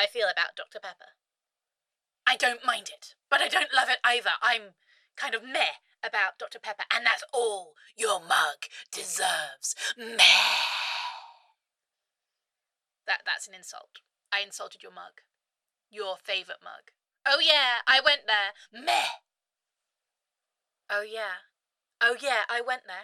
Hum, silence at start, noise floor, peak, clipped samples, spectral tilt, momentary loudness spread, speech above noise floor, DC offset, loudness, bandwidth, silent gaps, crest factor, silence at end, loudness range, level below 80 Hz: none; 0 s; -90 dBFS; -4 dBFS; under 0.1%; 1.5 dB/octave; 20 LU; 61 dB; under 0.1%; -26 LUFS; 16 kHz; none; 24 dB; 0 s; 11 LU; -78 dBFS